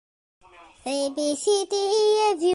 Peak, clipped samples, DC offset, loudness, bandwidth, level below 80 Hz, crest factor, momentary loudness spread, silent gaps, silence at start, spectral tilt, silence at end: -12 dBFS; under 0.1%; under 0.1%; -23 LUFS; 11.5 kHz; -68 dBFS; 12 dB; 8 LU; none; 0.6 s; -1.5 dB/octave; 0 s